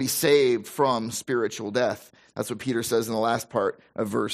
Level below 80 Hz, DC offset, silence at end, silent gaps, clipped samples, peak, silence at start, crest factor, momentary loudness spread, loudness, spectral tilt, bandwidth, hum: -66 dBFS; under 0.1%; 0 s; none; under 0.1%; -8 dBFS; 0 s; 18 dB; 12 LU; -25 LUFS; -4 dB/octave; 15.5 kHz; none